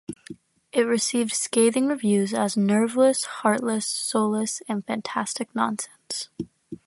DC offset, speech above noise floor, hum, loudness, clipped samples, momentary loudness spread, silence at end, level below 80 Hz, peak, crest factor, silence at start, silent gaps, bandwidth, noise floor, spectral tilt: under 0.1%; 22 dB; none; -24 LUFS; under 0.1%; 11 LU; 0.1 s; -68 dBFS; -6 dBFS; 18 dB; 0.1 s; none; 12 kHz; -45 dBFS; -4 dB/octave